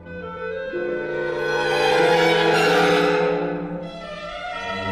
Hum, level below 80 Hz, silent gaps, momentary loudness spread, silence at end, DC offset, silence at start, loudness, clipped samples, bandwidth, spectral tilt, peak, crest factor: none; -52 dBFS; none; 15 LU; 0 s; under 0.1%; 0 s; -20 LUFS; under 0.1%; 15.5 kHz; -4.5 dB/octave; -8 dBFS; 14 dB